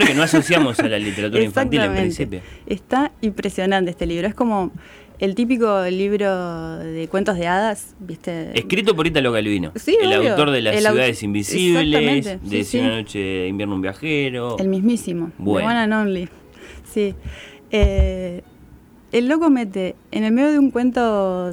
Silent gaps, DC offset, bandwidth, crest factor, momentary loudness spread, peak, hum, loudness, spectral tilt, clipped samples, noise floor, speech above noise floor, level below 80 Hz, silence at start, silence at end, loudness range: none; under 0.1%; 19 kHz; 14 dB; 12 LU; -6 dBFS; none; -19 LUFS; -5 dB/octave; under 0.1%; -46 dBFS; 27 dB; -34 dBFS; 0 s; 0 s; 5 LU